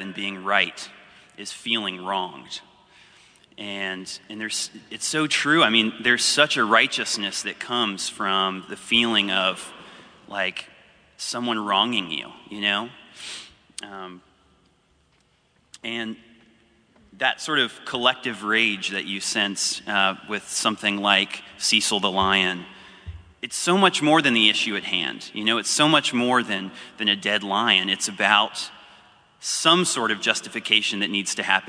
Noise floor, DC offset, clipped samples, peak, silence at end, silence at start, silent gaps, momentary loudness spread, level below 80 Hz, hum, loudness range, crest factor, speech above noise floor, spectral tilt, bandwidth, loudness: -63 dBFS; under 0.1%; under 0.1%; -2 dBFS; 0 s; 0 s; none; 18 LU; -60 dBFS; none; 11 LU; 22 dB; 40 dB; -2 dB/octave; 11 kHz; -21 LUFS